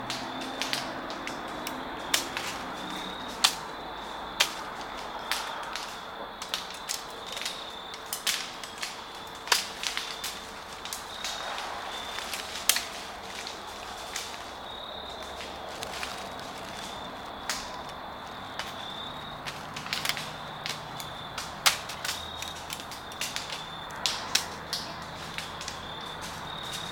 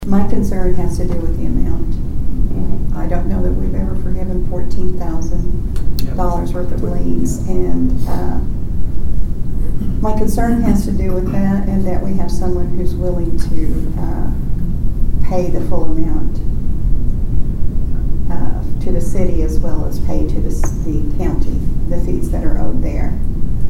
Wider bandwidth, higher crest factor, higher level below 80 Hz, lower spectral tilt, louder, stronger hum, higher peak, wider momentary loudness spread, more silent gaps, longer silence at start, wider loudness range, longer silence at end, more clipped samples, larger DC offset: first, 19 kHz vs 11.5 kHz; first, 34 dB vs 10 dB; second, -58 dBFS vs -16 dBFS; second, -1 dB/octave vs -8 dB/octave; second, -33 LUFS vs -20 LUFS; neither; about the same, -2 dBFS vs 0 dBFS; first, 12 LU vs 5 LU; neither; about the same, 0 s vs 0 s; first, 6 LU vs 3 LU; about the same, 0 s vs 0 s; neither; neither